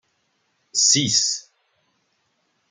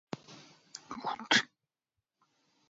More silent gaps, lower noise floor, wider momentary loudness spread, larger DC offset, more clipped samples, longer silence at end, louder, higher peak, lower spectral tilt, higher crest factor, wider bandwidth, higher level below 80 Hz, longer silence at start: neither; second, -69 dBFS vs -89 dBFS; second, 11 LU vs 21 LU; neither; neither; about the same, 1.3 s vs 1.25 s; first, -18 LUFS vs -31 LUFS; first, -4 dBFS vs -10 dBFS; about the same, -1 dB/octave vs 0 dB/octave; second, 22 dB vs 28 dB; first, 11.5 kHz vs 7.6 kHz; first, -66 dBFS vs -80 dBFS; first, 0.75 s vs 0.15 s